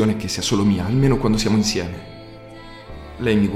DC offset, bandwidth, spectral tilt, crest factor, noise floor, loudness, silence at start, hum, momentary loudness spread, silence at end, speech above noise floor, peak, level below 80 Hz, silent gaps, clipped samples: under 0.1%; 15 kHz; -5.5 dB/octave; 16 dB; -38 dBFS; -19 LUFS; 0 s; none; 21 LU; 0 s; 20 dB; -4 dBFS; -36 dBFS; none; under 0.1%